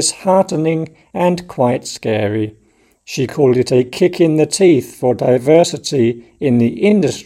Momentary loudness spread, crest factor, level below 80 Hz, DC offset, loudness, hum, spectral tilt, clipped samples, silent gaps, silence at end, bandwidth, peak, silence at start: 9 LU; 14 dB; -54 dBFS; under 0.1%; -15 LUFS; none; -5.5 dB/octave; under 0.1%; none; 0.05 s; 15.5 kHz; 0 dBFS; 0 s